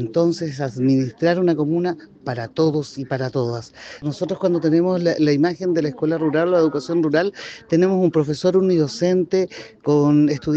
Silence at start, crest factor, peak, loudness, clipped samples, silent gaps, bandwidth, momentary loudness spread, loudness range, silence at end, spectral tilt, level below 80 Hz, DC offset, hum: 0 s; 12 dB; -6 dBFS; -20 LUFS; under 0.1%; none; 8.2 kHz; 10 LU; 4 LU; 0 s; -7 dB/octave; -60 dBFS; under 0.1%; none